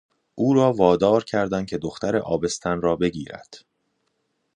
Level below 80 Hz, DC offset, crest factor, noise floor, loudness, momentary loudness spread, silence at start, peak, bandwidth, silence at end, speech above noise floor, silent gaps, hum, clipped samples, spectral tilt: -52 dBFS; under 0.1%; 20 dB; -73 dBFS; -22 LUFS; 11 LU; 0.35 s; -4 dBFS; 10.5 kHz; 1 s; 51 dB; none; none; under 0.1%; -6 dB/octave